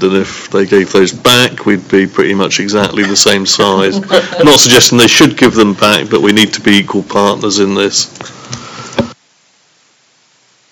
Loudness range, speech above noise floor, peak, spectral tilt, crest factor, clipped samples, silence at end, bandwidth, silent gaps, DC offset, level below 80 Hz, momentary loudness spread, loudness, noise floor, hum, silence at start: 8 LU; 42 dB; 0 dBFS; -3 dB/octave; 10 dB; 2%; 1.6 s; over 20 kHz; none; under 0.1%; -46 dBFS; 14 LU; -8 LUFS; -51 dBFS; none; 0 s